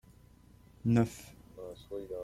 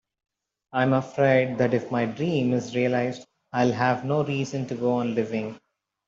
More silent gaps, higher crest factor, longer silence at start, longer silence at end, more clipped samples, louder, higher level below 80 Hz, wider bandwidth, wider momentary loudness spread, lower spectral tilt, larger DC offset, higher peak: neither; about the same, 20 dB vs 18 dB; about the same, 0.85 s vs 0.75 s; second, 0 s vs 0.5 s; neither; second, -33 LUFS vs -25 LUFS; first, -60 dBFS vs -66 dBFS; first, 14.5 kHz vs 7.6 kHz; first, 20 LU vs 10 LU; about the same, -7.5 dB/octave vs -7 dB/octave; neither; second, -16 dBFS vs -6 dBFS